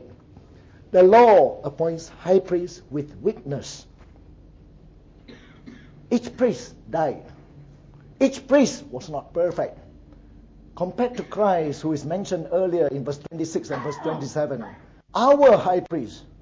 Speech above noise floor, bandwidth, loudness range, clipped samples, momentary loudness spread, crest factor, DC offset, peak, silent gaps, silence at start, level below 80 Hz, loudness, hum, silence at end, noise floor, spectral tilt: 28 dB; 8 kHz; 11 LU; under 0.1%; 17 LU; 18 dB; under 0.1%; -4 dBFS; none; 0.9 s; -52 dBFS; -22 LUFS; none; 0.2 s; -49 dBFS; -6 dB/octave